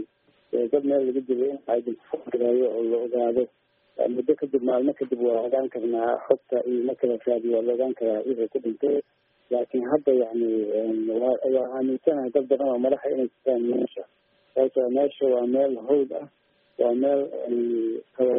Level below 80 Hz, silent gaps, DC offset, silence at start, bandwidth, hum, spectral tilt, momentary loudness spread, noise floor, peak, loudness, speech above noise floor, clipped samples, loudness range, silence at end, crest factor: -72 dBFS; none; under 0.1%; 0 s; 3.7 kHz; none; -6 dB/octave; 6 LU; -56 dBFS; -4 dBFS; -25 LUFS; 32 dB; under 0.1%; 1 LU; 0 s; 20 dB